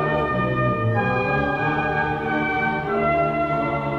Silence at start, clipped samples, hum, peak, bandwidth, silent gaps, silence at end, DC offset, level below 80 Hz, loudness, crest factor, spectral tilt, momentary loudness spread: 0 s; under 0.1%; none; -8 dBFS; 7.4 kHz; none; 0 s; under 0.1%; -42 dBFS; -21 LUFS; 12 dB; -8.5 dB/octave; 2 LU